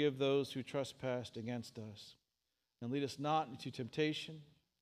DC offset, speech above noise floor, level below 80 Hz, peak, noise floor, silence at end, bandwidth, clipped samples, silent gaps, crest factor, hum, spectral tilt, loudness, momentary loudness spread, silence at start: under 0.1%; 48 dB; -80 dBFS; -22 dBFS; -88 dBFS; 0.35 s; 15 kHz; under 0.1%; none; 18 dB; none; -5.5 dB/octave; -40 LUFS; 15 LU; 0 s